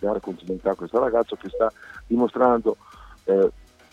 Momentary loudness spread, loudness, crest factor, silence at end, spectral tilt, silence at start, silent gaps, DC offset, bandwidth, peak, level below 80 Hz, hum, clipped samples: 11 LU; -23 LUFS; 18 dB; 0.45 s; -8 dB/octave; 0 s; none; under 0.1%; 7.6 kHz; -4 dBFS; -50 dBFS; none; under 0.1%